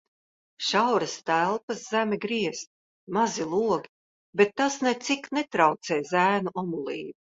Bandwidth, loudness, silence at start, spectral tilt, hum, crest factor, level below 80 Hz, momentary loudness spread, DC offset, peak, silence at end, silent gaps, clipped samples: 8 kHz; -26 LUFS; 0.6 s; -4 dB/octave; none; 20 dB; -70 dBFS; 9 LU; under 0.1%; -6 dBFS; 0.1 s; 1.63-1.68 s, 2.67-3.07 s, 3.89-4.33 s; under 0.1%